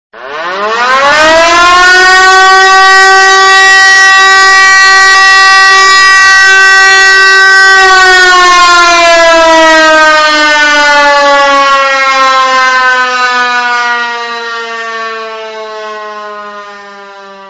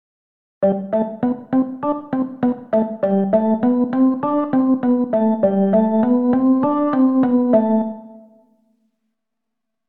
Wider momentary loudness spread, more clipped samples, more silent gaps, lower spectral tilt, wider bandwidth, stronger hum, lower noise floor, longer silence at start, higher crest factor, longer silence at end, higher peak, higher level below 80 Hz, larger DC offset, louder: first, 16 LU vs 6 LU; first, 9% vs under 0.1%; neither; second, 0.5 dB/octave vs -12 dB/octave; first, 11 kHz vs 3.7 kHz; neither; second, -27 dBFS vs -81 dBFS; second, 0.15 s vs 0.6 s; second, 4 dB vs 14 dB; second, 0 s vs 1.7 s; first, 0 dBFS vs -4 dBFS; first, -38 dBFS vs -60 dBFS; neither; first, -2 LUFS vs -18 LUFS